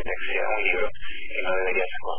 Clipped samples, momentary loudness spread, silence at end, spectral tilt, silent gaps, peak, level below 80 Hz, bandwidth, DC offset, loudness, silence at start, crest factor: under 0.1%; 8 LU; 0 s; -7 dB/octave; none; -10 dBFS; -48 dBFS; 3.5 kHz; 6%; -26 LUFS; 0 s; 16 dB